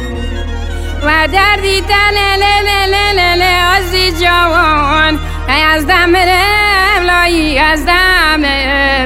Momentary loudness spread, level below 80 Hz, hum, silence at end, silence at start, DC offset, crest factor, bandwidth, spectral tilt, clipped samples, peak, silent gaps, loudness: 6 LU; -22 dBFS; none; 0 s; 0 s; under 0.1%; 10 dB; 16.5 kHz; -4 dB/octave; under 0.1%; 0 dBFS; none; -9 LUFS